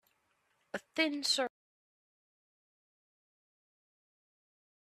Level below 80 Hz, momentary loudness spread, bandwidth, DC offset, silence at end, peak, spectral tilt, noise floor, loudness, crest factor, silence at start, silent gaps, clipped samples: under -90 dBFS; 14 LU; 14 kHz; under 0.1%; 3.4 s; -18 dBFS; -1 dB/octave; -77 dBFS; -33 LUFS; 24 dB; 0.75 s; none; under 0.1%